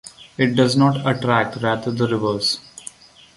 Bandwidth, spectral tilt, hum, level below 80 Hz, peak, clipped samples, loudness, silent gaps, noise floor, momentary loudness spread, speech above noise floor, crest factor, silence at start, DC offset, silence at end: 11.5 kHz; -5.5 dB/octave; none; -54 dBFS; -2 dBFS; under 0.1%; -19 LUFS; none; -42 dBFS; 20 LU; 23 dB; 18 dB; 0.05 s; under 0.1%; 0.45 s